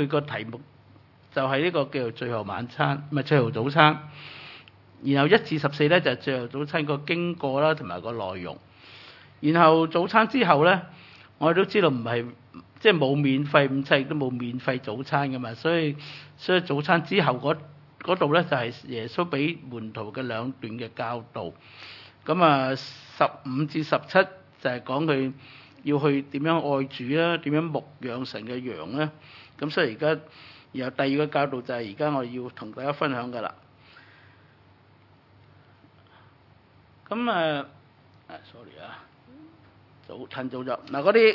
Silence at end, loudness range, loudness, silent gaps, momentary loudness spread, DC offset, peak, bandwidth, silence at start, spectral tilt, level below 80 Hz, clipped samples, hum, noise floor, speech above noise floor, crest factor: 0 s; 10 LU; -25 LUFS; none; 18 LU; under 0.1%; 0 dBFS; 6 kHz; 0 s; -8 dB/octave; -74 dBFS; under 0.1%; none; -57 dBFS; 32 dB; 26 dB